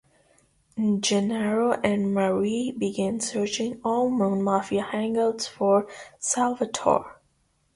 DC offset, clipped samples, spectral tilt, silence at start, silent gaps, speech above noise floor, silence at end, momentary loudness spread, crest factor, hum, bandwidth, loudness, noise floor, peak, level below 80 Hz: under 0.1%; under 0.1%; -4.5 dB/octave; 0.75 s; none; 44 dB; 0.65 s; 5 LU; 20 dB; none; 11.5 kHz; -25 LUFS; -68 dBFS; -6 dBFS; -62 dBFS